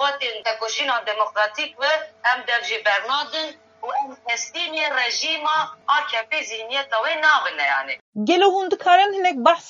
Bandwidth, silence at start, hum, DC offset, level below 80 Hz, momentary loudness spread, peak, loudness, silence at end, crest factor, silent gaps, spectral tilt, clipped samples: 7.6 kHz; 0 s; none; under 0.1%; -82 dBFS; 9 LU; -2 dBFS; -21 LUFS; 0 s; 20 dB; 8.01-8.13 s; -1.5 dB/octave; under 0.1%